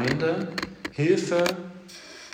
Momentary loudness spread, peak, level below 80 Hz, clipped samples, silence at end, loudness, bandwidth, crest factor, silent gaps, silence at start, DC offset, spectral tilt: 19 LU; -10 dBFS; -58 dBFS; under 0.1%; 0 s; -26 LUFS; 16.5 kHz; 18 dB; none; 0 s; under 0.1%; -5.5 dB/octave